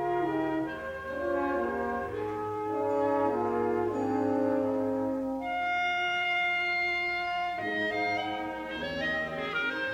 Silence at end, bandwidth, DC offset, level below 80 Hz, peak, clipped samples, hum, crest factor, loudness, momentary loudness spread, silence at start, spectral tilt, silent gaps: 0 s; 16 kHz; under 0.1%; -58 dBFS; -16 dBFS; under 0.1%; none; 14 dB; -30 LUFS; 7 LU; 0 s; -5.5 dB/octave; none